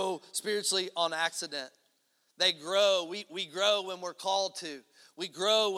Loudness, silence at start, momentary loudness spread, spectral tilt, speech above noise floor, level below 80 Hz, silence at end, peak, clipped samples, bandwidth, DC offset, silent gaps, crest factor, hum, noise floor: -30 LUFS; 0 s; 14 LU; -1 dB/octave; 42 dB; -90 dBFS; 0 s; -12 dBFS; under 0.1%; 16 kHz; under 0.1%; none; 20 dB; none; -74 dBFS